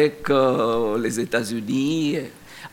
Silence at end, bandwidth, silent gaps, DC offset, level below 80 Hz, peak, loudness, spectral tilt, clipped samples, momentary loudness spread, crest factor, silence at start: 0.05 s; 17 kHz; none; under 0.1%; -58 dBFS; -6 dBFS; -22 LUFS; -5 dB/octave; under 0.1%; 9 LU; 16 dB; 0 s